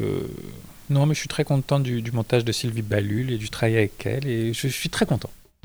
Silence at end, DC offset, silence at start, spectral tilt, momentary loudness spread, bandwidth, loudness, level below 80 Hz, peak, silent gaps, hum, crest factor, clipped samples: 0.3 s; under 0.1%; 0 s; -5.5 dB/octave; 8 LU; over 20 kHz; -24 LUFS; -48 dBFS; -6 dBFS; none; none; 18 dB; under 0.1%